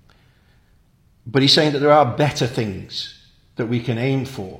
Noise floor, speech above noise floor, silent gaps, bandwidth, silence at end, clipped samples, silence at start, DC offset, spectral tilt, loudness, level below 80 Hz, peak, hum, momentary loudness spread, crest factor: -56 dBFS; 38 dB; none; 16 kHz; 0 s; under 0.1%; 1.25 s; under 0.1%; -5.5 dB/octave; -18 LUFS; -54 dBFS; 0 dBFS; none; 15 LU; 20 dB